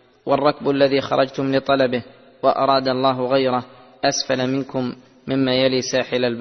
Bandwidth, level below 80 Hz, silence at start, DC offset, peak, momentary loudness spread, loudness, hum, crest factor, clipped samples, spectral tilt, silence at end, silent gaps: 6.4 kHz; -58 dBFS; 0.25 s; under 0.1%; -2 dBFS; 8 LU; -20 LUFS; none; 18 dB; under 0.1%; -4.5 dB/octave; 0 s; none